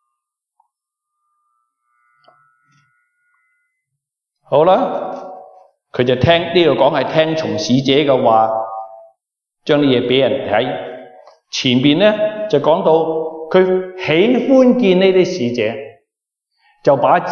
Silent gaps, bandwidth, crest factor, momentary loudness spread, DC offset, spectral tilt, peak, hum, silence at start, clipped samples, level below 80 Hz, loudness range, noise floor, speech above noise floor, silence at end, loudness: none; 7 kHz; 16 dB; 15 LU; under 0.1%; -6 dB/octave; 0 dBFS; none; 4.5 s; under 0.1%; -54 dBFS; 7 LU; -79 dBFS; 66 dB; 0 s; -14 LUFS